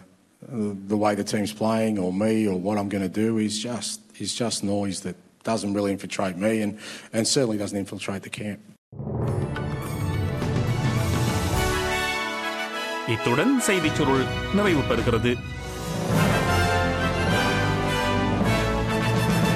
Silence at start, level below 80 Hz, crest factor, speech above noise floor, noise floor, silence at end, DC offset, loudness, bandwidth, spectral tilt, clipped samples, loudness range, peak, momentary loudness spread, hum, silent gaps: 0 s; -38 dBFS; 16 dB; 24 dB; -48 dBFS; 0 s; under 0.1%; -24 LUFS; 16 kHz; -5 dB/octave; under 0.1%; 5 LU; -8 dBFS; 9 LU; none; 8.78-8.92 s